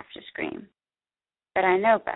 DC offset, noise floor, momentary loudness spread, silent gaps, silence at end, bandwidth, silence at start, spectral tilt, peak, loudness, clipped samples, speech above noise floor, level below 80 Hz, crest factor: under 0.1%; under -90 dBFS; 18 LU; none; 0 s; 4.1 kHz; 0.15 s; -9 dB/octave; -8 dBFS; -25 LUFS; under 0.1%; over 66 dB; -66 dBFS; 20 dB